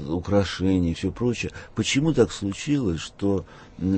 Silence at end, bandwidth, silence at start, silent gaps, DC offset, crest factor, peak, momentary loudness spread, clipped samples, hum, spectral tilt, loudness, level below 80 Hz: 0 s; 8.8 kHz; 0 s; none; under 0.1%; 18 dB; -6 dBFS; 8 LU; under 0.1%; none; -5.5 dB/octave; -25 LUFS; -44 dBFS